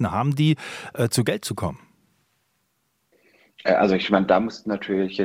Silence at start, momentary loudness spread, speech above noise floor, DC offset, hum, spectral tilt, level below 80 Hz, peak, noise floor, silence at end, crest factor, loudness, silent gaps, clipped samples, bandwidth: 0 s; 10 LU; 49 dB; under 0.1%; none; -5.5 dB/octave; -58 dBFS; -2 dBFS; -71 dBFS; 0 s; 22 dB; -23 LUFS; none; under 0.1%; 16 kHz